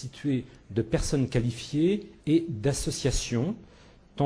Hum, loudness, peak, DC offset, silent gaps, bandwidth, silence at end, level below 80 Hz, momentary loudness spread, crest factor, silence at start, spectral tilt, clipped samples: none; -28 LUFS; -12 dBFS; under 0.1%; none; 11 kHz; 0 s; -40 dBFS; 7 LU; 16 dB; 0 s; -5.5 dB/octave; under 0.1%